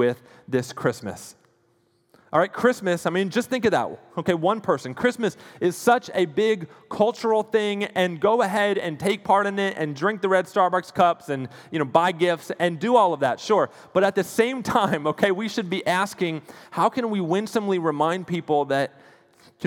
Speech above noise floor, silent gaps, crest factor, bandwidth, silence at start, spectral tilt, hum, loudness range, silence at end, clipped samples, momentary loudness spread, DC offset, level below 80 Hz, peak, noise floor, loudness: 42 dB; none; 20 dB; 18.5 kHz; 0 s; -5.5 dB/octave; none; 3 LU; 0 s; under 0.1%; 8 LU; under 0.1%; -66 dBFS; -4 dBFS; -65 dBFS; -23 LUFS